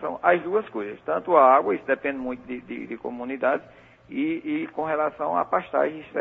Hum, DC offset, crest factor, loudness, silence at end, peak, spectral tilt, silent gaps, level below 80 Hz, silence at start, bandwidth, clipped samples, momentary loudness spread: none; under 0.1%; 22 dB; -24 LUFS; 0 s; -4 dBFS; -8 dB/octave; none; -64 dBFS; 0 s; 4 kHz; under 0.1%; 16 LU